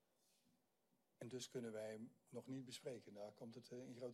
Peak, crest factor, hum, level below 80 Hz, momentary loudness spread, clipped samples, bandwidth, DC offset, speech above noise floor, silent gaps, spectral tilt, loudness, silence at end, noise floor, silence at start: -40 dBFS; 16 dB; none; under -90 dBFS; 7 LU; under 0.1%; 14.5 kHz; under 0.1%; 32 dB; none; -5 dB/octave; -54 LUFS; 0 s; -85 dBFS; 1.2 s